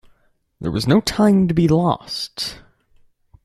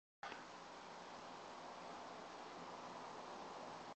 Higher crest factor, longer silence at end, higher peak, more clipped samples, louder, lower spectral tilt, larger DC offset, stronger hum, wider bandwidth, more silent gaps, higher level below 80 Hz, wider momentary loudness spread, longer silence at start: about the same, 18 dB vs 16 dB; first, 0.9 s vs 0 s; first, -2 dBFS vs -38 dBFS; neither; first, -18 LUFS vs -53 LUFS; first, -6 dB/octave vs -3.5 dB/octave; neither; neither; first, 13.5 kHz vs 8.4 kHz; neither; first, -44 dBFS vs -84 dBFS; first, 12 LU vs 2 LU; first, 0.6 s vs 0.25 s